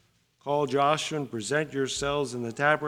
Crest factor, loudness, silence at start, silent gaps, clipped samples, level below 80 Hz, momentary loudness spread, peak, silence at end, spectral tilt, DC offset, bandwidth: 20 dB; -28 LUFS; 0.45 s; none; under 0.1%; -58 dBFS; 8 LU; -8 dBFS; 0 s; -4 dB/octave; under 0.1%; 15.5 kHz